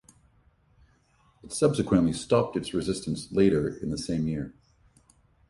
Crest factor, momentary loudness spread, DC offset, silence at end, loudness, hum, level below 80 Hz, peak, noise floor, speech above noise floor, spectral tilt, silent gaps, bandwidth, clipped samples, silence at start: 20 dB; 9 LU; under 0.1%; 1 s; -27 LUFS; none; -50 dBFS; -10 dBFS; -64 dBFS; 38 dB; -6 dB/octave; none; 11.5 kHz; under 0.1%; 1.45 s